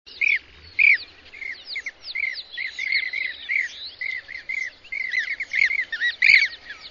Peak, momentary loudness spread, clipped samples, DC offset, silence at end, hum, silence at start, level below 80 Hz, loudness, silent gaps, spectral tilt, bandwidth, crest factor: -2 dBFS; 15 LU; under 0.1%; under 0.1%; 0 s; none; 0.05 s; -62 dBFS; -21 LUFS; none; 1 dB/octave; 7.4 kHz; 22 dB